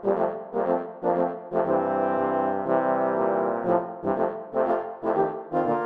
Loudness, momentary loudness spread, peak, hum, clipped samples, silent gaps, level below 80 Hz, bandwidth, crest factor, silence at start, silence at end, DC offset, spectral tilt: -26 LUFS; 4 LU; -8 dBFS; none; under 0.1%; none; -72 dBFS; 4.5 kHz; 16 dB; 0 s; 0 s; under 0.1%; -10 dB/octave